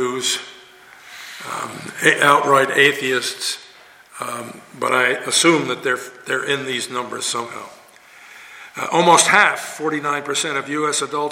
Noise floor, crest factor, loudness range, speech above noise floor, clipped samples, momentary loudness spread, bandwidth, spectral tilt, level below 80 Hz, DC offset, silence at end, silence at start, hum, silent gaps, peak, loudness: -46 dBFS; 20 dB; 3 LU; 27 dB; under 0.1%; 19 LU; 17 kHz; -2 dB/octave; -68 dBFS; under 0.1%; 0 s; 0 s; none; none; 0 dBFS; -18 LUFS